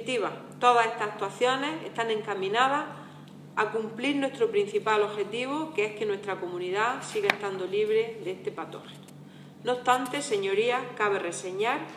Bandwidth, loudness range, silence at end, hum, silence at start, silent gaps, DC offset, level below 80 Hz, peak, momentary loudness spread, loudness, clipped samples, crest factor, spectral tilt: 14.5 kHz; 3 LU; 0 s; none; 0 s; none; under 0.1%; -82 dBFS; -2 dBFS; 13 LU; -28 LUFS; under 0.1%; 26 dB; -3.5 dB/octave